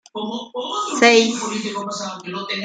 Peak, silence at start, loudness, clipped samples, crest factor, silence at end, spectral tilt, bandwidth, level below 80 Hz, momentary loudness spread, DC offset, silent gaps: 0 dBFS; 0.15 s; -19 LUFS; under 0.1%; 20 dB; 0 s; -2.5 dB/octave; 9.4 kHz; -70 dBFS; 15 LU; under 0.1%; none